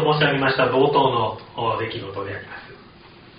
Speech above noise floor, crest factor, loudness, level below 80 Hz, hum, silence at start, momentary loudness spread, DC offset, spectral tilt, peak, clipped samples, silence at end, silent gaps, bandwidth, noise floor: 25 dB; 18 dB; -21 LUFS; -54 dBFS; none; 0 s; 15 LU; under 0.1%; -3.5 dB/octave; -4 dBFS; under 0.1%; 0.55 s; none; 5.2 kHz; -46 dBFS